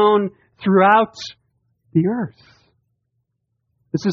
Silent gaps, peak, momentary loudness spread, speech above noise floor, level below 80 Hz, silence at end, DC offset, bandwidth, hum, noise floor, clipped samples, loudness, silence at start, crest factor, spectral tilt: none; -2 dBFS; 17 LU; 56 dB; -64 dBFS; 0 s; under 0.1%; 7.2 kHz; none; -73 dBFS; under 0.1%; -18 LUFS; 0 s; 18 dB; -5 dB/octave